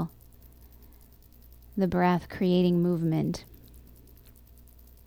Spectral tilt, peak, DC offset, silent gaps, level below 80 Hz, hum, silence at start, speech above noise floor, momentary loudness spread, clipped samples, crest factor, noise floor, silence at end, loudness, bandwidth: -8 dB/octave; -12 dBFS; under 0.1%; none; -52 dBFS; 60 Hz at -55 dBFS; 0 s; 28 dB; 14 LU; under 0.1%; 18 dB; -54 dBFS; 1.25 s; -27 LUFS; 16.5 kHz